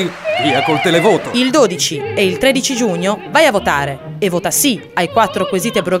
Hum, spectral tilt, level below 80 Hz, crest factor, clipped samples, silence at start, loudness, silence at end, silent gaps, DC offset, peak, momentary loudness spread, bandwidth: none; -3.5 dB/octave; -46 dBFS; 14 dB; under 0.1%; 0 s; -14 LUFS; 0 s; none; under 0.1%; 0 dBFS; 6 LU; 16 kHz